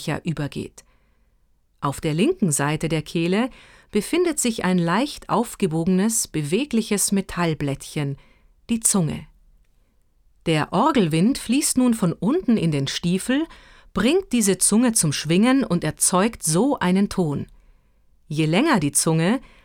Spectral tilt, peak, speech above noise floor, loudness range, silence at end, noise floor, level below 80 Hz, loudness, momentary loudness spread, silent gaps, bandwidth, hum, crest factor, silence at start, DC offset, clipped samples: -4.5 dB/octave; -2 dBFS; 41 dB; 5 LU; 0.25 s; -61 dBFS; -50 dBFS; -21 LUFS; 10 LU; none; 19.5 kHz; none; 20 dB; 0 s; under 0.1%; under 0.1%